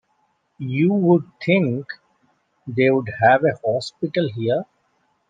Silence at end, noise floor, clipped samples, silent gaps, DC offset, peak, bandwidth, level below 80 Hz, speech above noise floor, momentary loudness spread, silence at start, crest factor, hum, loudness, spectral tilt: 0.65 s; -67 dBFS; under 0.1%; none; under 0.1%; -2 dBFS; 9.2 kHz; -66 dBFS; 48 dB; 17 LU; 0.6 s; 18 dB; none; -20 LUFS; -7.5 dB/octave